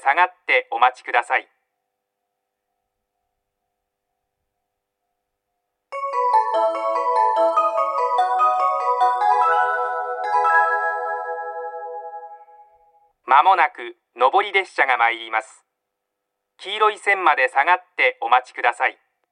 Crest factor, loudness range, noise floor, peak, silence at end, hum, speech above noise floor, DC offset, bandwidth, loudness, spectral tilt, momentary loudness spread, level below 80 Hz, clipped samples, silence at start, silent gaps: 20 dB; 7 LU; -79 dBFS; 0 dBFS; 0.4 s; none; 59 dB; under 0.1%; 10 kHz; -19 LUFS; -0.5 dB/octave; 13 LU; -86 dBFS; under 0.1%; 0.05 s; none